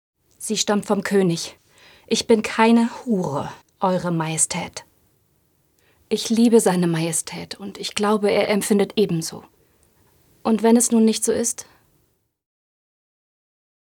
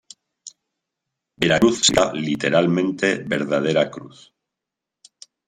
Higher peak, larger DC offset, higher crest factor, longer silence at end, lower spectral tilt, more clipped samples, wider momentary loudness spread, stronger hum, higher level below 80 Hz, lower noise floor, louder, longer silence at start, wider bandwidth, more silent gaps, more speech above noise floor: about the same, -2 dBFS vs -2 dBFS; neither; about the same, 20 dB vs 20 dB; first, 2.35 s vs 1.4 s; about the same, -4.5 dB/octave vs -4 dB/octave; neither; first, 16 LU vs 8 LU; neither; second, -64 dBFS vs -54 dBFS; second, -66 dBFS vs -85 dBFS; about the same, -20 LUFS vs -19 LUFS; about the same, 0.4 s vs 0.45 s; first, 18 kHz vs 16 kHz; neither; second, 47 dB vs 66 dB